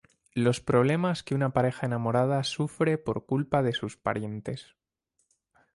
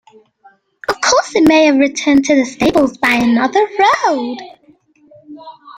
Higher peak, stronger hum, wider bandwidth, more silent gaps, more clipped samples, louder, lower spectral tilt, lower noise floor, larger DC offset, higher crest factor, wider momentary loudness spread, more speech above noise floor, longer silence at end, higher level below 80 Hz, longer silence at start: second, -10 dBFS vs 0 dBFS; neither; second, 11.5 kHz vs 16 kHz; neither; neither; second, -28 LUFS vs -12 LUFS; first, -6.5 dB/octave vs -3.5 dB/octave; first, -77 dBFS vs -50 dBFS; neither; about the same, 18 dB vs 14 dB; about the same, 10 LU vs 11 LU; first, 50 dB vs 38 dB; first, 1.1 s vs 0.05 s; second, -60 dBFS vs -48 dBFS; second, 0.35 s vs 0.9 s